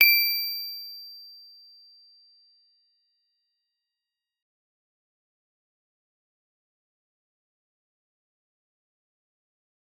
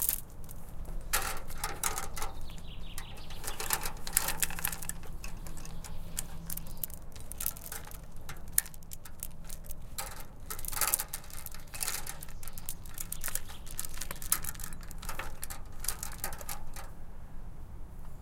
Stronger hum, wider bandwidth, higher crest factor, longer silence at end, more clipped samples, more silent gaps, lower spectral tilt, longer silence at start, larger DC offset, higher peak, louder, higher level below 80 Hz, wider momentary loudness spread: neither; first, over 20 kHz vs 17 kHz; about the same, 30 dB vs 32 dB; first, 8.7 s vs 0 s; neither; neither; second, 4 dB/octave vs -1.5 dB/octave; about the same, 0 s vs 0 s; neither; about the same, -4 dBFS vs -4 dBFS; first, -24 LUFS vs -37 LUFS; second, under -90 dBFS vs -42 dBFS; first, 27 LU vs 16 LU